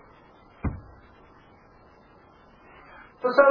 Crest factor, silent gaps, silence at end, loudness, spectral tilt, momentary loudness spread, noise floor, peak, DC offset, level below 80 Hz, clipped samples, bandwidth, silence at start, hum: 26 dB; none; 0 s; -26 LUFS; -5 dB/octave; 29 LU; -54 dBFS; -2 dBFS; under 0.1%; -48 dBFS; under 0.1%; 5.2 kHz; 0.65 s; none